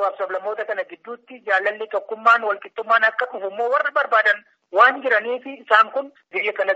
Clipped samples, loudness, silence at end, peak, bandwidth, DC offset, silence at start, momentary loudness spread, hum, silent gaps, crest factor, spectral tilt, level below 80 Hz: under 0.1%; -20 LUFS; 0 s; 0 dBFS; 8 kHz; under 0.1%; 0 s; 13 LU; none; none; 20 dB; 2 dB/octave; -86 dBFS